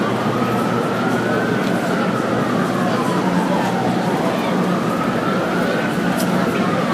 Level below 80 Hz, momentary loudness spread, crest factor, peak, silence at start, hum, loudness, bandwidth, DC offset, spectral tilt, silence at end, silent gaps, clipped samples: -52 dBFS; 1 LU; 14 dB; -4 dBFS; 0 s; none; -18 LUFS; 15.5 kHz; under 0.1%; -6 dB/octave; 0 s; none; under 0.1%